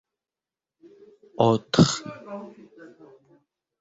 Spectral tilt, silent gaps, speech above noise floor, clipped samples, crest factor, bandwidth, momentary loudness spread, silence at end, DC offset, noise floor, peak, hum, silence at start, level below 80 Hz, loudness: -5.5 dB/octave; none; over 68 dB; under 0.1%; 24 dB; 8 kHz; 23 LU; 1.3 s; under 0.1%; under -90 dBFS; -4 dBFS; none; 1.4 s; -58 dBFS; -22 LUFS